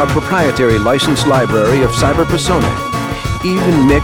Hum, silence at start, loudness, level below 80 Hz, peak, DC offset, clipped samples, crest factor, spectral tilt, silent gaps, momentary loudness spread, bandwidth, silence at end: none; 0 s; -13 LUFS; -28 dBFS; 0 dBFS; under 0.1%; under 0.1%; 12 dB; -5.5 dB/octave; none; 7 LU; 18 kHz; 0 s